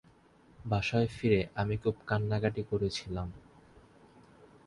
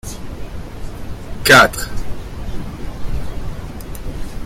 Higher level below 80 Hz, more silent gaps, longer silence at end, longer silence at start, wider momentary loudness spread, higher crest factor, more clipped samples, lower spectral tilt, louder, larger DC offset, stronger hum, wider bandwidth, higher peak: second, -52 dBFS vs -28 dBFS; neither; first, 0.2 s vs 0 s; first, 0.6 s vs 0.05 s; second, 10 LU vs 23 LU; about the same, 20 dB vs 18 dB; neither; first, -6.5 dB/octave vs -3.5 dB/octave; second, -32 LUFS vs -13 LUFS; neither; neither; second, 11 kHz vs 16.5 kHz; second, -14 dBFS vs 0 dBFS